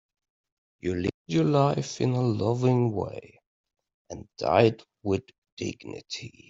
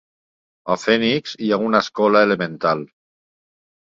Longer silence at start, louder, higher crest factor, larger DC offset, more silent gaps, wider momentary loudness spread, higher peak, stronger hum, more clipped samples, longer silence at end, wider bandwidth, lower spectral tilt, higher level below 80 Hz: first, 0.85 s vs 0.65 s; second, -27 LUFS vs -19 LUFS; about the same, 22 dB vs 18 dB; neither; first, 1.14-1.25 s, 3.46-3.64 s, 3.94-4.05 s, 5.38-5.42 s, 5.52-5.57 s vs none; first, 16 LU vs 8 LU; second, -6 dBFS vs -2 dBFS; neither; neither; second, 0.2 s vs 1.15 s; about the same, 7.8 kHz vs 7.8 kHz; first, -7 dB/octave vs -5 dB/octave; about the same, -62 dBFS vs -62 dBFS